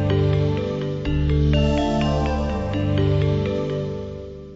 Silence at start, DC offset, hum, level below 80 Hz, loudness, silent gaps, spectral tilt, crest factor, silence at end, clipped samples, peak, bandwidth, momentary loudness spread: 0 s; under 0.1%; none; -28 dBFS; -22 LUFS; none; -8 dB/octave; 12 dB; 0 s; under 0.1%; -8 dBFS; 7.8 kHz; 8 LU